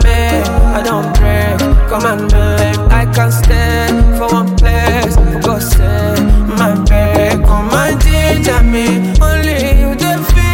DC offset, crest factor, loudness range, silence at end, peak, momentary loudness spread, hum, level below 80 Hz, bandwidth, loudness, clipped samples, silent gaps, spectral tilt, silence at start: under 0.1%; 8 dB; 1 LU; 0 s; 0 dBFS; 2 LU; none; -12 dBFS; 17 kHz; -11 LUFS; under 0.1%; none; -5.5 dB/octave; 0 s